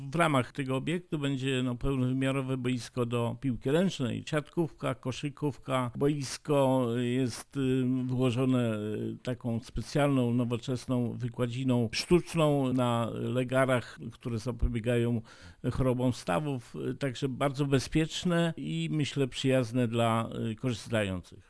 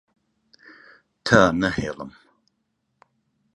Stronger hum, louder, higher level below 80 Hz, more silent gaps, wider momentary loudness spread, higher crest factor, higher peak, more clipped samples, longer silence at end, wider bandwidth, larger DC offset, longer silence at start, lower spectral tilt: neither; second, -30 LUFS vs -20 LUFS; about the same, -48 dBFS vs -48 dBFS; neither; second, 8 LU vs 20 LU; second, 18 dB vs 24 dB; second, -12 dBFS vs 0 dBFS; neither; second, 0.1 s vs 1.45 s; about the same, 11 kHz vs 11 kHz; neither; second, 0 s vs 1.25 s; about the same, -6.5 dB/octave vs -5.5 dB/octave